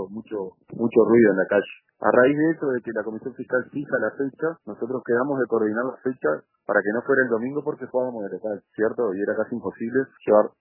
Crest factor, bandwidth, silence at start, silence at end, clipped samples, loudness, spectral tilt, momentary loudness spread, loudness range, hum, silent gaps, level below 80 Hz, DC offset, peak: 20 dB; 3.1 kHz; 0 s; 0.15 s; under 0.1%; -23 LUFS; -11 dB/octave; 13 LU; 5 LU; none; none; -70 dBFS; under 0.1%; -4 dBFS